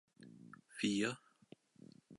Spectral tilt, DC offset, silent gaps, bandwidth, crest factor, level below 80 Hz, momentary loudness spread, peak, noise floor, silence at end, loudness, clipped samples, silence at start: -4 dB/octave; under 0.1%; none; 11.5 kHz; 22 dB; -84 dBFS; 25 LU; -22 dBFS; -65 dBFS; 0 s; -39 LUFS; under 0.1%; 0.2 s